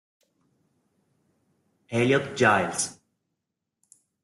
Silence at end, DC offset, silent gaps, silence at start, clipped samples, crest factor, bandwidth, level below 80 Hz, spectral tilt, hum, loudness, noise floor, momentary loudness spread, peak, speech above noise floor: 1.3 s; under 0.1%; none; 1.9 s; under 0.1%; 22 dB; 12.5 kHz; -68 dBFS; -4 dB/octave; none; -24 LUFS; -83 dBFS; 10 LU; -6 dBFS; 60 dB